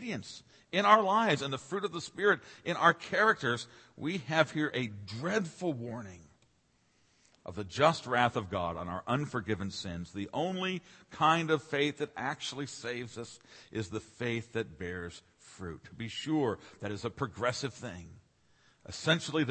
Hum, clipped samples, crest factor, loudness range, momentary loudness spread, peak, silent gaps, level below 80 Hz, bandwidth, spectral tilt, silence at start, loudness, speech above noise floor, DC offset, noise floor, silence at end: none; under 0.1%; 24 dB; 9 LU; 17 LU; -8 dBFS; none; -66 dBFS; 8.8 kHz; -5 dB/octave; 0 s; -32 LUFS; 38 dB; under 0.1%; -71 dBFS; 0 s